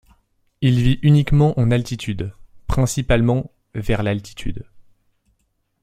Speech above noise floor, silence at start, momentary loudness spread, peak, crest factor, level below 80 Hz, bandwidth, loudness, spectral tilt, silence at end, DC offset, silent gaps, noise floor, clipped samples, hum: 50 dB; 0.6 s; 16 LU; -2 dBFS; 16 dB; -32 dBFS; 14.5 kHz; -19 LUFS; -7 dB/octave; 1 s; under 0.1%; none; -68 dBFS; under 0.1%; none